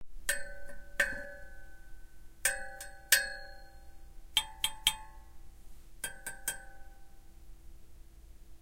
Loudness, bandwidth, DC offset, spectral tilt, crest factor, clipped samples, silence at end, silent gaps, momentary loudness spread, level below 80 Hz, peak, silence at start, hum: -33 LUFS; 16 kHz; under 0.1%; 1 dB/octave; 30 dB; under 0.1%; 0 s; none; 24 LU; -52 dBFS; -8 dBFS; 0 s; none